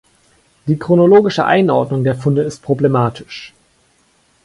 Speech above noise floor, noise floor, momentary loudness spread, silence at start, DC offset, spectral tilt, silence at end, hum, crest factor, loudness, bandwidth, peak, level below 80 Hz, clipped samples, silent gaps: 43 dB; -56 dBFS; 18 LU; 0.65 s; under 0.1%; -7.5 dB/octave; 0.95 s; none; 14 dB; -14 LUFS; 11.5 kHz; 0 dBFS; -52 dBFS; under 0.1%; none